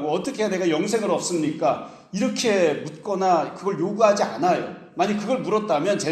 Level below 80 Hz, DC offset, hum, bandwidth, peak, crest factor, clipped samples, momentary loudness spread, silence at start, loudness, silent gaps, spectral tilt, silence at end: -68 dBFS; under 0.1%; none; 13.5 kHz; -6 dBFS; 18 dB; under 0.1%; 7 LU; 0 s; -23 LUFS; none; -4.5 dB/octave; 0 s